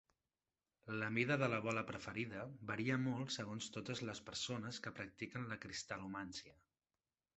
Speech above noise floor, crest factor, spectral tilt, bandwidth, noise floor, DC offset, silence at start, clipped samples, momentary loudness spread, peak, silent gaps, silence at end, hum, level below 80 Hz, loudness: over 46 dB; 22 dB; -4.5 dB/octave; 8.2 kHz; under -90 dBFS; under 0.1%; 0.85 s; under 0.1%; 11 LU; -22 dBFS; none; 0.85 s; none; -74 dBFS; -43 LUFS